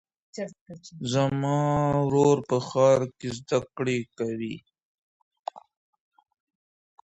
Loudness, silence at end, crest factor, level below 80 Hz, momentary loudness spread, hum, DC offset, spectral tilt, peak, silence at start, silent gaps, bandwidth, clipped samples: -25 LUFS; 1.5 s; 18 dB; -60 dBFS; 19 LU; none; under 0.1%; -6.5 dB/octave; -10 dBFS; 0.35 s; 0.61-0.66 s, 4.85-5.31 s, 5.39-5.44 s; 8.2 kHz; under 0.1%